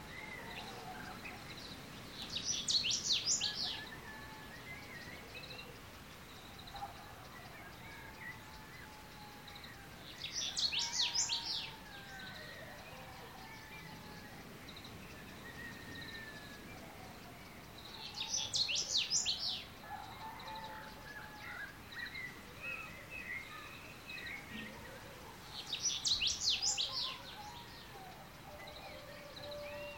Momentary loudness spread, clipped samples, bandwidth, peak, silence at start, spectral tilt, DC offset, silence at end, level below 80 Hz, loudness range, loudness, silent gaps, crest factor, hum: 19 LU; under 0.1%; 17 kHz; -22 dBFS; 0 s; -0.5 dB/octave; under 0.1%; 0 s; -64 dBFS; 13 LU; -39 LUFS; none; 22 dB; none